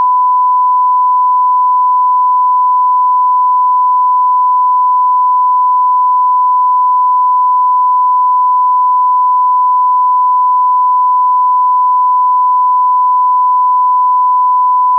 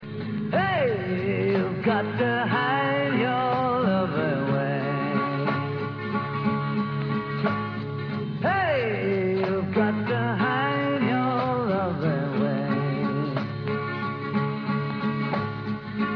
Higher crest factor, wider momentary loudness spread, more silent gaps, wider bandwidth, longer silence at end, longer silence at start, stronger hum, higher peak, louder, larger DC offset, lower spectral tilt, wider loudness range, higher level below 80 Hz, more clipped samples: second, 4 dB vs 14 dB; second, 0 LU vs 6 LU; neither; second, 1.1 kHz vs 5.4 kHz; about the same, 0 s vs 0 s; about the same, 0 s vs 0 s; neither; first, -6 dBFS vs -10 dBFS; first, -9 LUFS vs -26 LUFS; neither; second, -2 dB/octave vs -9.5 dB/octave; second, 0 LU vs 3 LU; second, under -90 dBFS vs -60 dBFS; neither